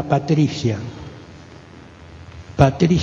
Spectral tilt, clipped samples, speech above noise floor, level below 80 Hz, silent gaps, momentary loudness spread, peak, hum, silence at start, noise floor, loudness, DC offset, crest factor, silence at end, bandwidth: -7 dB/octave; under 0.1%; 25 dB; -40 dBFS; none; 25 LU; 0 dBFS; none; 0 s; -41 dBFS; -18 LUFS; under 0.1%; 20 dB; 0 s; 7.6 kHz